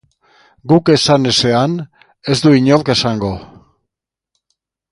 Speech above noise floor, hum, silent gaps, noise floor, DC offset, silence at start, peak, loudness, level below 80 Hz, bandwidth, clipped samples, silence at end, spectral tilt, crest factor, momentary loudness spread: 68 dB; none; none; -81 dBFS; under 0.1%; 0.65 s; 0 dBFS; -13 LUFS; -46 dBFS; 11.5 kHz; under 0.1%; 1.45 s; -5.5 dB/octave; 16 dB; 17 LU